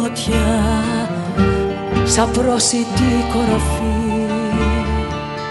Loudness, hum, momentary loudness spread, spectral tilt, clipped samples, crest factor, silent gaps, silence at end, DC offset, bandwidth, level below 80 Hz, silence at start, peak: -17 LUFS; none; 6 LU; -5 dB/octave; under 0.1%; 16 dB; none; 0 s; under 0.1%; 12 kHz; -26 dBFS; 0 s; 0 dBFS